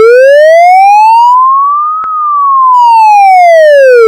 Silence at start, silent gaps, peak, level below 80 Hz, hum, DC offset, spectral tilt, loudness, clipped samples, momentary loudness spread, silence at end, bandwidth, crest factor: 0 s; none; 0 dBFS; -66 dBFS; none; under 0.1%; 1 dB/octave; -3 LUFS; 20%; 7 LU; 0 s; 16 kHz; 2 dB